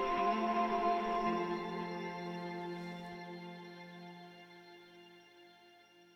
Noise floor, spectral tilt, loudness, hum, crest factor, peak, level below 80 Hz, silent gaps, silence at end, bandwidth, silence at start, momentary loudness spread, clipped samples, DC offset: -63 dBFS; -6.5 dB/octave; -37 LUFS; none; 18 dB; -22 dBFS; -66 dBFS; none; 0.1 s; 15.5 kHz; 0 s; 23 LU; under 0.1%; under 0.1%